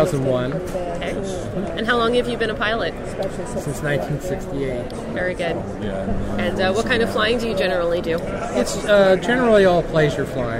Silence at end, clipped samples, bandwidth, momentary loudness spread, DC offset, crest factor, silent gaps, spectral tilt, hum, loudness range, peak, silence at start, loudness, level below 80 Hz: 0 s; under 0.1%; 16 kHz; 11 LU; under 0.1%; 16 dB; none; -5.5 dB/octave; none; 7 LU; -4 dBFS; 0 s; -21 LUFS; -36 dBFS